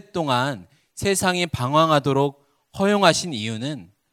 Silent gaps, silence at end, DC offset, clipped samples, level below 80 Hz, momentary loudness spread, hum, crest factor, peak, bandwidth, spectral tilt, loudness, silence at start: none; 0.25 s; under 0.1%; under 0.1%; -52 dBFS; 13 LU; none; 22 dB; 0 dBFS; 16 kHz; -4.5 dB/octave; -21 LUFS; 0.15 s